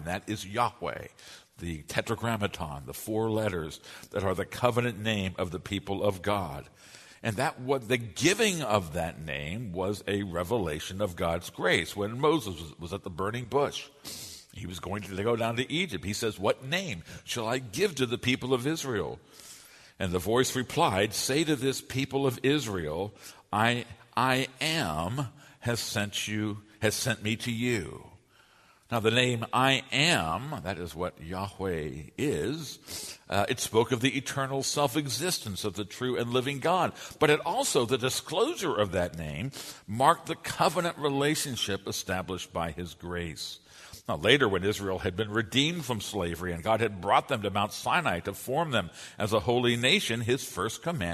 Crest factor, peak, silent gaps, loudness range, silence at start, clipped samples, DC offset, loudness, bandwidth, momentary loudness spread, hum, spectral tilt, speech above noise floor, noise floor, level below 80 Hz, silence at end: 24 dB; -6 dBFS; none; 4 LU; 0 s; under 0.1%; under 0.1%; -29 LUFS; 13.5 kHz; 13 LU; none; -4 dB/octave; 31 dB; -61 dBFS; -56 dBFS; 0 s